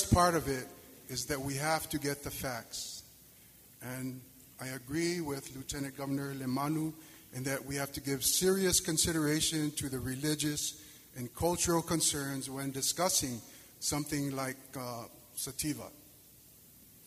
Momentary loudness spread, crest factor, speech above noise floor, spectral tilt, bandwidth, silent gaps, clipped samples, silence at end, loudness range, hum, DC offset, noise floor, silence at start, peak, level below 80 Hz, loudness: 17 LU; 22 dB; 24 dB; -3.5 dB/octave; 15.5 kHz; none; under 0.1%; 0 s; 9 LU; none; under 0.1%; -58 dBFS; 0 s; -12 dBFS; -54 dBFS; -33 LUFS